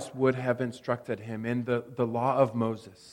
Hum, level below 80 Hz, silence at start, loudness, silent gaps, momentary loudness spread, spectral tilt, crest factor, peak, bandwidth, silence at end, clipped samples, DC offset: none; -70 dBFS; 0 s; -29 LUFS; none; 8 LU; -7.5 dB/octave; 20 dB; -10 dBFS; 16 kHz; 0 s; under 0.1%; under 0.1%